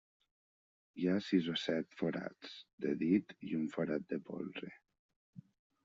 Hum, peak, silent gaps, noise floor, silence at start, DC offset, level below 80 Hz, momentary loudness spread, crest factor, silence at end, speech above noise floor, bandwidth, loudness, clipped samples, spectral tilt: none; -20 dBFS; 2.73-2.78 s, 4.99-5.09 s, 5.16-5.33 s; under -90 dBFS; 0.95 s; under 0.1%; -80 dBFS; 15 LU; 20 dB; 0.45 s; over 53 dB; 7.6 kHz; -38 LUFS; under 0.1%; -5.5 dB/octave